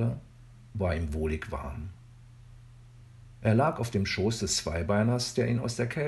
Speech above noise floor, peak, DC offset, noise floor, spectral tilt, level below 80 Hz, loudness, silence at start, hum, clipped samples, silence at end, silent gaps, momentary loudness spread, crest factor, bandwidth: 23 dB; -10 dBFS; under 0.1%; -51 dBFS; -5 dB/octave; -44 dBFS; -29 LUFS; 0 s; none; under 0.1%; 0 s; none; 13 LU; 20 dB; 12.5 kHz